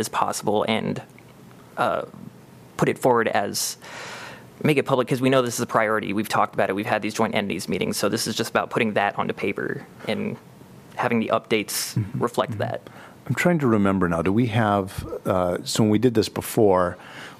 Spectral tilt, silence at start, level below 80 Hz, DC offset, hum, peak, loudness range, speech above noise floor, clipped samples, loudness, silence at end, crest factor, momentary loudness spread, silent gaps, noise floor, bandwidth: -5 dB/octave; 0 s; -58 dBFS; under 0.1%; none; -4 dBFS; 4 LU; 24 dB; under 0.1%; -23 LUFS; 0.05 s; 20 dB; 14 LU; none; -47 dBFS; 15.5 kHz